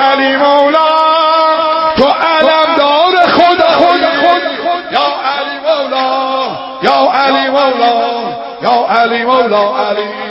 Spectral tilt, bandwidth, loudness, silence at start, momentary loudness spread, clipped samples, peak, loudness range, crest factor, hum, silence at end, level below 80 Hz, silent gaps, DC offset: -5 dB/octave; 8 kHz; -10 LUFS; 0 s; 7 LU; 0.3%; 0 dBFS; 4 LU; 10 dB; none; 0 s; -48 dBFS; none; under 0.1%